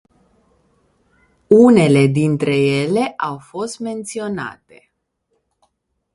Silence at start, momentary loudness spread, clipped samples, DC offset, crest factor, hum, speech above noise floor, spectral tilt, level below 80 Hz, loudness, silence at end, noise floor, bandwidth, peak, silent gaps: 1.5 s; 16 LU; under 0.1%; under 0.1%; 18 dB; none; 54 dB; -6.5 dB/octave; -56 dBFS; -16 LUFS; 1.65 s; -69 dBFS; 11.5 kHz; 0 dBFS; none